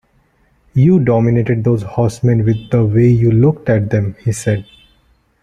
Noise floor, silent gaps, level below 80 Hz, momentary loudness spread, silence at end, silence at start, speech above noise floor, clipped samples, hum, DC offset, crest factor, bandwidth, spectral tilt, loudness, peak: -56 dBFS; none; -42 dBFS; 8 LU; 0.8 s; 0.75 s; 43 dB; under 0.1%; none; under 0.1%; 14 dB; 11 kHz; -8.5 dB/octave; -14 LUFS; 0 dBFS